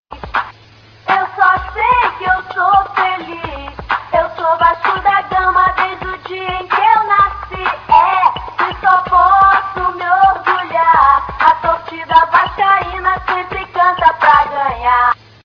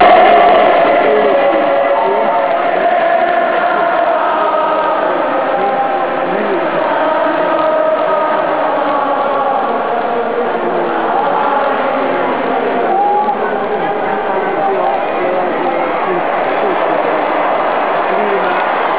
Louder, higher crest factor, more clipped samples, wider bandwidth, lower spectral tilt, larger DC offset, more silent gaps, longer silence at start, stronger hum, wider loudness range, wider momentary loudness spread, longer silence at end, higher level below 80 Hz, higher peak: about the same, -13 LUFS vs -13 LUFS; about the same, 14 dB vs 12 dB; neither; first, 6.6 kHz vs 4 kHz; second, -5.5 dB/octave vs -8 dB/octave; second, under 0.1% vs 1%; neither; about the same, 0.1 s vs 0 s; neither; about the same, 3 LU vs 3 LU; first, 11 LU vs 5 LU; first, 0.3 s vs 0 s; first, -38 dBFS vs -54 dBFS; about the same, 0 dBFS vs 0 dBFS